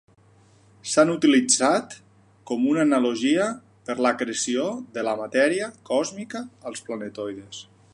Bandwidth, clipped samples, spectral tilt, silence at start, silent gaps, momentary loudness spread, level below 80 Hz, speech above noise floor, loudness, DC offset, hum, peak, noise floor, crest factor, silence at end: 11.5 kHz; under 0.1%; -3 dB/octave; 0.85 s; none; 17 LU; -70 dBFS; 33 dB; -23 LUFS; under 0.1%; none; -6 dBFS; -56 dBFS; 18 dB; 0.3 s